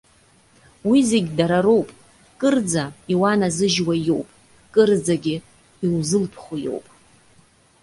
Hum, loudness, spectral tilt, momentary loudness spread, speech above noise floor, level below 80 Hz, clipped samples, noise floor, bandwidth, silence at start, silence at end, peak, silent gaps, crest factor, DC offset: none; -20 LUFS; -5 dB/octave; 12 LU; 36 dB; -56 dBFS; under 0.1%; -55 dBFS; 11.5 kHz; 0.85 s; 1.05 s; -4 dBFS; none; 18 dB; under 0.1%